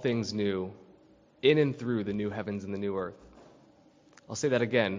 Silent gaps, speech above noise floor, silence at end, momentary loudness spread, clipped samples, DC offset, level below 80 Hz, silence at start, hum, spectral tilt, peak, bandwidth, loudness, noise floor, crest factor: none; 31 dB; 0 s; 11 LU; under 0.1%; under 0.1%; -62 dBFS; 0 s; none; -5.5 dB/octave; -10 dBFS; 7.6 kHz; -30 LUFS; -60 dBFS; 22 dB